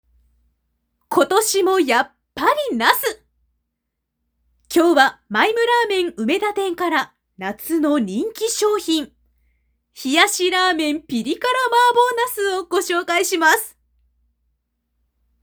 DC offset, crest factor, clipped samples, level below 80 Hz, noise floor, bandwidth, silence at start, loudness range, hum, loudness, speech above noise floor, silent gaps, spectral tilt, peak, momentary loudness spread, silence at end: under 0.1%; 20 dB; under 0.1%; -60 dBFS; -78 dBFS; over 20 kHz; 1.1 s; 3 LU; none; -18 LUFS; 60 dB; none; -2 dB/octave; 0 dBFS; 9 LU; 1.7 s